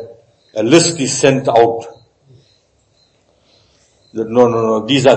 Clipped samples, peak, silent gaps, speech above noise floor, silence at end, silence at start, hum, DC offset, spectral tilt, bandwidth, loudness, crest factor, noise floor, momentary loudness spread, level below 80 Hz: 0.1%; 0 dBFS; none; 45 dB; 0 s; 0 s; none; under 0.1%; -4.5 dB/octave; 9.6 kHz; -13 LUFS; 16 dB; -57 dBFS; 16 LU; -56 dBFS